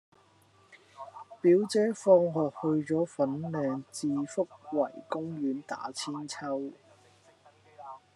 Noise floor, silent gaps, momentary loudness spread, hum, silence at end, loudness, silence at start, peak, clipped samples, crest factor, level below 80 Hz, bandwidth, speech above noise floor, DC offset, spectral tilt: -63 dBFS; none; 22 LU; none; 0.2 s; -30 LUFS; 1 s; -10 dBFS; under 0.1%; 22 dB; -84 dBFS; 12 kHz; 34 dB; under 0.1%; -6 dB/octave